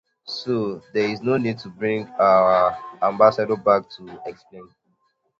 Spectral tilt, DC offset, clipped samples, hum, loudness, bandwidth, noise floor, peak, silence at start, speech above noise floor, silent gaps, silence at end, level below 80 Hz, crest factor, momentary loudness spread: -7 dB/octave; under 0.1%; under 0.1%; none; -20 LUFS; 7.2 kHz; -68 dBFS; -2 dBFS; 0.25 s; 48 dB; none; 0.75 s; -62 dBFS; 20 dB; 19 LU